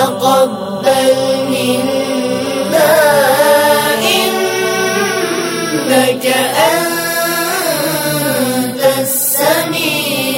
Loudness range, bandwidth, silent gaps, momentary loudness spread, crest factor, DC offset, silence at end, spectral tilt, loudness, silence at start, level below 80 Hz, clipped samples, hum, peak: 2 LU; 16.5 kHz; none; 6 LU; 12 dB; under 0.1%; 0 s; -3 dB/octave; -12 LUFS; 0 s; -58 dBFS; under 0.1%; none; 0 dBFS